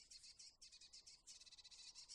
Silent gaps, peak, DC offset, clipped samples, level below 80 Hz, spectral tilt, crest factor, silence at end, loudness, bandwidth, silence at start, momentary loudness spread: none; -44 dBFS; under 0.1%; under 0.1%; -84 dBFS; 2 dB/octave; 20 dB; 0 s; -60 LUFS; 11.5 kHz; 0 s; 2 LU